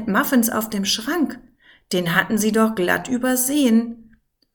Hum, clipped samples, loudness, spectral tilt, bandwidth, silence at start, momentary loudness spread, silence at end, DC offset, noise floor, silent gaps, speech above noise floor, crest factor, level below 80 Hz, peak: none; under 0.1%; -19 LUFS; -3.5 dB/octave; 19.5 kHz; 0 s; 7 LU; 0.55 s; under 0.1%; -55 dBFS; none; 36 dB; 18 dB; -54 dBFS; -2 dBFS